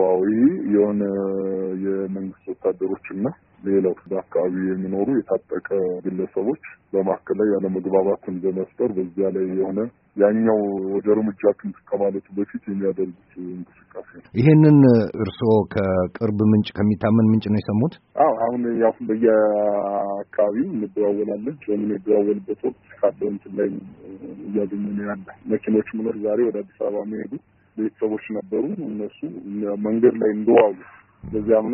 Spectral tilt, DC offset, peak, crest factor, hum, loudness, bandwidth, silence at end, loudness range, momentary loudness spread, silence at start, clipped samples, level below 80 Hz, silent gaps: -8.5 dB/octave; under 0.1%; -2 dBFS; 20 dB; none; -21 LUFS; 4.5 kHz; 0 s; 7 LU; 12 LU; 0 s; under 0.1%; -58 dBFS; none